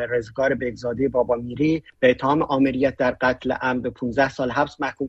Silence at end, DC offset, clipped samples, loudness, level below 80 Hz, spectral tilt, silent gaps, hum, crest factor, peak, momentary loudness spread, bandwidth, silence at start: 0 s; under 0.1%; under 0.1%; -22 LUFS; -48 dBFS; -7 dB/octave; none; none; 18 dB; -4 dBFS; 6 LU; 8 kHz; 0 s